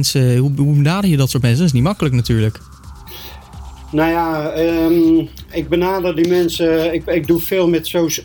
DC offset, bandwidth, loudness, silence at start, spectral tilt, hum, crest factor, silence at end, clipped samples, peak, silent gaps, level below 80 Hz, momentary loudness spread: under 0.1%; 19.5 kHz; -15 LUFS; 0 s; -6 dB/octave; none; 12 dB; 0 s; under 0.1%; -4 dBFS; none; -36 dBFS; 18 LU